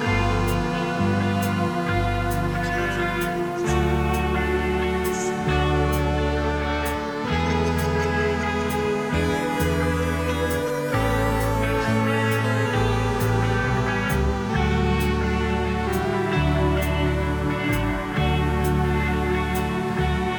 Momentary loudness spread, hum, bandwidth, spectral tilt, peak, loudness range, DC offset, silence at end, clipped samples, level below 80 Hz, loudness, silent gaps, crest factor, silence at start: 3 LU; none; over 20 kHz; -6 dB/octave; -8 dBFS; 1 LU; under 0.1%; 0 s; under 0.1%; -32 dBFS; -23 LUFS; none; 14 dB; 0 s